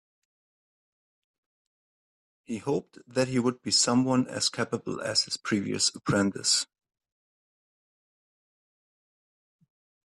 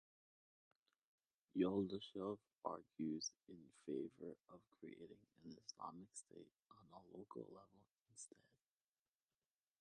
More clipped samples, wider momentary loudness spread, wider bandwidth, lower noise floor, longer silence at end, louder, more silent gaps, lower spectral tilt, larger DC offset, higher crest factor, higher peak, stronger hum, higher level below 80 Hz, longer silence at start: neither; second, 9 LU vs 21 LU; first, 12.5 kHz vs 10 kHz; about the same, under -90 dBFS vs under -90 dBFS; first, 3.45 s vs 1.55 s; first, -27 LUFS vs -49 LUFS; second, none vs 8.01-8.05 s; second, -3 dB/octave vs -5 dB/octave; neither; about the same, 20 dB vs 24 dB; first, -12 dBFS vs -28 dBFS; neither; first, -70 dBFS vs -84 dBFS; first, 2.5 s vs 1.55 s